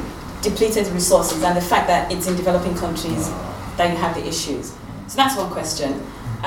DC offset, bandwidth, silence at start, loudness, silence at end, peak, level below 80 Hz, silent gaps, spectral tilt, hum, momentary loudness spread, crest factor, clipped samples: under 0.1%; 19 kHz; 0 s; -20 LUFS; 0 s; 0 dBFS; -38 dBFS; none; -4 dB/octave; none; 12 LU; 20 dB; under 0.1%